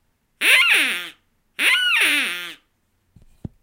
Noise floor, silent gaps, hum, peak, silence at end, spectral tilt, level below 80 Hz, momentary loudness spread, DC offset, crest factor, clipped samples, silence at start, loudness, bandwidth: -67 dBFS; none; none; -2 dBFS; 1.1 s; 0 dB/octave; -58 dBFS; 21 LU; under 0.1%; 20 dB; under 0.1%; 0.4 s; -16 LUFS; 16 kHz